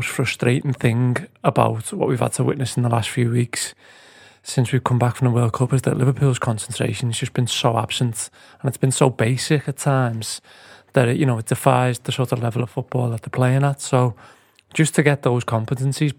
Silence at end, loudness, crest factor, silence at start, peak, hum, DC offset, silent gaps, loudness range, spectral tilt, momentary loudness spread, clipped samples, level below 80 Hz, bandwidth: 0.05 s; -20 LUFS; 20 dB; 0 s; 0 dBFS; none; under 0.1%; none; 1 LU; -5.5 dB/octave; 6 LU; under 0.1%; -58 dBFS; 16 kHz